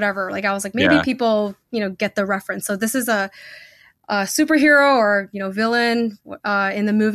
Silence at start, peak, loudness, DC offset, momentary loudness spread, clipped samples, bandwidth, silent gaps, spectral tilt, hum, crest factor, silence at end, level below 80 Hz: 0 s; -2 dBFS; -19 LUFS; under 0.1%; 12 LU; under 0.1%; 15.5 kHz; none; -4 dB/octave; none; 16 dB; 0 s; -58 dBFS